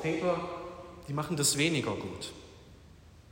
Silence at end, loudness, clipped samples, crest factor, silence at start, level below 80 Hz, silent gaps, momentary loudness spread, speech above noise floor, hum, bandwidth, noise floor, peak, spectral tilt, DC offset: 0.1 s; -31 LUFS; under 0.1%; 20 dB; 0 s; -60 dBFS; none; 19 LU; 23 dB; none; 16 kHz; -55 dBFS; -14 dBFS; -3.5 dB/octave; under 0.1%